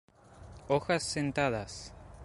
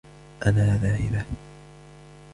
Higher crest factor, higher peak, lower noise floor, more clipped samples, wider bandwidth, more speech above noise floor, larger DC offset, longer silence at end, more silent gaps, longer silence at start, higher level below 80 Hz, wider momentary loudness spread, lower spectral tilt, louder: about the same, 20 dB vs 20 dB; second, -14 dBFS vs -6 dBFS; first, -52 dBFS vs -47 dBFS; neither; about the same, 11.5 kHz vs 11.5 kHz; second, 20 dB vs 25 dB; neither; second, 0 s vs 0.45 s; neither; about the same, 0.3 s vs 0.4 s; second, -54 dBFS vs -40 dBFS; first, 20 LU vs 16 LU; second, -4.5 dB/octave vs -7.5 dB/octave; second, -32 LUFS vs -24 LUFS